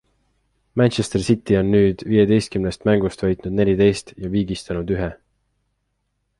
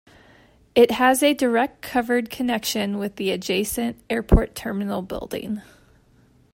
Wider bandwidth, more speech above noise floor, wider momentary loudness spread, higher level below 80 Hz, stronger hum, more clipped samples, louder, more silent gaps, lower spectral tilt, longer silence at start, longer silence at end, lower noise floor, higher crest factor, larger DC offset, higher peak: second, 11.5 kHz vs 16.5 kHz; first, 53 dB vs 35 dB; second, 9 LU vs 12 LU; second, -42 dBFS vs -32 dBFS; first, 50 Hz at -40 dBFS vs none; neither; about the same, -20 LUFS vs -22 LUFS; neither; first, -7 dB/octave vs -4.5 dB/octave; about the same, 0.75 s vs 0.75 s; first, 1.25 s vs 0.95 s; first, -72 dBFS vs -56 dBFS; about the same, 18 dB vs 20 dB; neither; about the same, -2 dBFS vs -2 dBFS